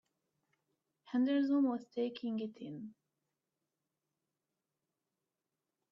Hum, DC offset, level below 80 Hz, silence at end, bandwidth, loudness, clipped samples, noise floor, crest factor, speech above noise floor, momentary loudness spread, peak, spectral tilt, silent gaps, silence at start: none; under 0.1%; -88 dBFS; 3 s; 5.8 kHz; -36 LUFS; under 0.1%; -90 dBFS; 16 dB; 55 dB; 16 LU; -24 dBFS; -7.5 dB/octave; none; 1.1 s